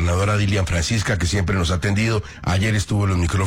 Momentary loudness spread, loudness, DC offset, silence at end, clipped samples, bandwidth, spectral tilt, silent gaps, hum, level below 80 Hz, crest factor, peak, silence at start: 2 LU; -20 LUFS; under 0.1%; 0 s; under 0.1%; 14 kHz; -5 dB/octave; none; none; -34 dBFS; 8 dB; -10 dBFS; 0 s